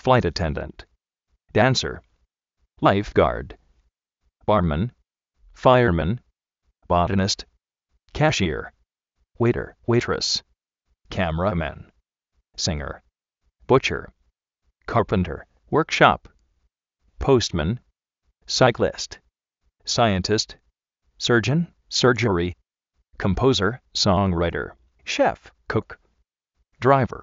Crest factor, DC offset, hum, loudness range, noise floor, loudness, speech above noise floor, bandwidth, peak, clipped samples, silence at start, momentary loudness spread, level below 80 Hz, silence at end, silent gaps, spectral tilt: 24 dB; under 0.1%; none; 4 LU; -73 dBFS; -22 LUFS; 52 dB; 8 kHz; 0 dBFS; under 0.1%; 0.05 s; 14 LU; -42 dBFS; 0 s; none; -4.5 dB/octave